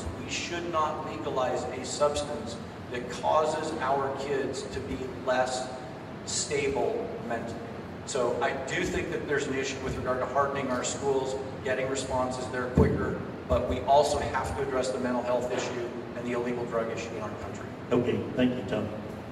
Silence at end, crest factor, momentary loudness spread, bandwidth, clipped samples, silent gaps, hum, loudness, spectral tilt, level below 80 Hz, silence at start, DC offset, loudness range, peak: 0 s; 22 dB; 10 LU; 14 kHz; under 0.1%; none; none; -30 LUFS; -4.5 dB/octave; -48 dBFS; 0 s; under 0.1%; 4 LU; -8 dBFS